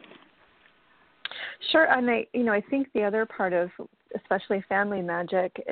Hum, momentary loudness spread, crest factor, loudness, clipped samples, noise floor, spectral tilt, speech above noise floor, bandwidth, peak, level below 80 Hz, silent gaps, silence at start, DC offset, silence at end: none; 15 LU; 20 dB; -26 LUFS; under 0.1%; -61 dBFS; -9 dB/octave; 35 dB; 4.7 kHz; -8 dBFS; -70 dBFS; none; 1.25 s; under 0.1%; 0 s